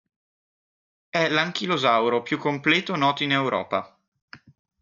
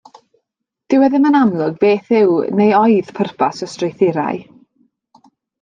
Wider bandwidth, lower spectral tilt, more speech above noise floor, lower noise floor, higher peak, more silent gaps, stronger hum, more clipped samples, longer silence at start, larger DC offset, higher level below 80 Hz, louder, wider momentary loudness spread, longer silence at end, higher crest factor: second, 7.6 kHz vs 9.2 kHz; second, -5 dB/octave vs -7 dB/octave; first, over 67 dB vs 63 dB; first, under -90 dBFS vs -77 dBFS; second, -8 dBFS vs -2 dBFS; first, 4.08-4.12 s, 4.22-4.28 s vs none; neither; neither; first, 1.15 s vs 0.9 s; neither; second, -70 dBFS vs -62 dBFS; second, -23 LUFS vs -15 LUFS; second, 6 LU vs 11 LU; second, 0.45 s vs 1.2 s; about the same, 18 dB vs 14 dB